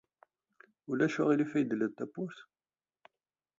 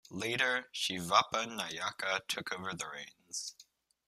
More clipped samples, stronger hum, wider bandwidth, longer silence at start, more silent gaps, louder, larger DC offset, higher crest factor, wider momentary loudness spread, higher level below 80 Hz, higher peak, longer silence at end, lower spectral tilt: neither; neither; second, 7.6 kHz vs 15 kHz; first, 0.9 s vs 0.1 s; neither; about the same, -33 LUFS vs -34 LUFS; neither; second, 20 dB vs 26 dB; first, 16 LU vs 13 LU; about the same, -80 dBFS vs -76 dBFS; second, -16 dBFS vs -10 dBFS; first, 1.15 s vs 0.45 s; first, -7 dB/octave vs -2 dB/octave